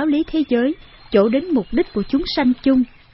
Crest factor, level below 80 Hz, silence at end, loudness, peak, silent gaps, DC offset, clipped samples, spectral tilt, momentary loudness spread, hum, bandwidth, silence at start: 16 dB; -40 dBFS; 0.3 s; -19 LUFS; -2 dBFS; none; under 0.1%; under 0.1%; -10 dB/octave; 5 LU; none; 5.8 kHz; 0 s